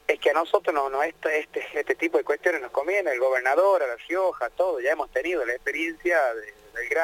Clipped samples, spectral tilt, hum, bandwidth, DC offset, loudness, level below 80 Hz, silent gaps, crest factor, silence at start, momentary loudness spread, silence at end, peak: under 0.1%; -2.5 dB/octave; none; 17 kHz; under 0.1%; -25 LUFS; -60 dBFS; none; 18 dB; 0.1 s; 6 LU; 0 s; -6 dBFS